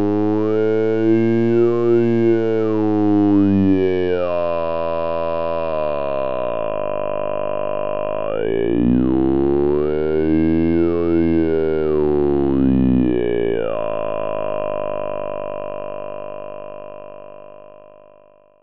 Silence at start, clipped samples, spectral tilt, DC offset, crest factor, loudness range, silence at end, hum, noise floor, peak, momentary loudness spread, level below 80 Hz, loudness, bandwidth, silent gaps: 0 s; under 0.1%; -10 dB/octave; 4%; 12 dB; 10 LU; 0 s; 50 Hz at -50 dBFS; -50 dBFS; -6 dBFS; 12 LU; -38 dBFS; -18 LUFS; 5.6 kHz; none